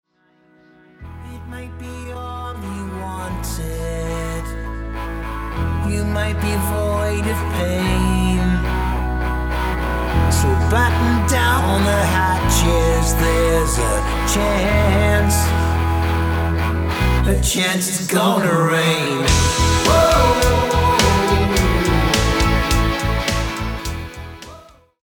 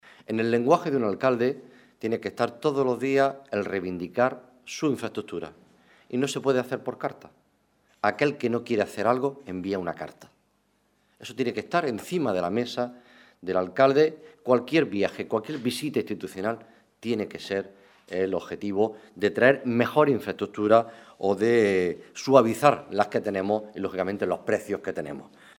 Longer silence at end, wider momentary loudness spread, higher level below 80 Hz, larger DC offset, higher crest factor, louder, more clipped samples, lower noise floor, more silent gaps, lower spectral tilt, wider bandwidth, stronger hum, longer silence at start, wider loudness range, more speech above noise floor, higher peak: about the same, 0.45 s vs 0.35 s; about the same, 13 LU vs 13 LU; first, -24 dBFS vs -70 dBFS; neither; second, 16 dB vs 22 dB; first, -18 LUFS vs -26 LUFS; neither; second, -57 dBFS vs -69 dBFS; neither; second, -4.5 dB/octave vs -6 dB/octave; first, 19.5 kHz vs 17.5 kHz; neither; first, 1 s vs 0.3 s; first, 11 LU vs 7 LU; about the same, 40 dB vs 43 dB; about the same, -2 dBFS vs -4 dBFS